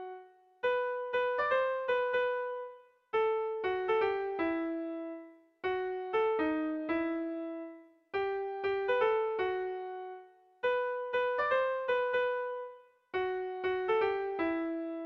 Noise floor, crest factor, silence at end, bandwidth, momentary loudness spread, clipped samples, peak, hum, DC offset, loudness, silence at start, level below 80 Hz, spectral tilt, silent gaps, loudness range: -54 dBFS; 14 dB; 0 s; 6 kHz; 12 LU; under 0.1%; -18 dBFS; none; under 0.1%; -33 LUFS; 0 s; -70 dBFS; -6 dB/octave; none; 2 LU